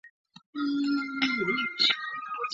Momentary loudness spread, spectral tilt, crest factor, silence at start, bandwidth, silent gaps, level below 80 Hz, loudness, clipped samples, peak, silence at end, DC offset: 10 LU; -3.5 dB/octave; 18 dB; 0.05 s; 7.6 kHz; 0.10-0.25 s, 0.46-0.53 s; -74 dBFS; -27 LUFS; under 0.1%; -12 dBFS; 0 s; under 0.1%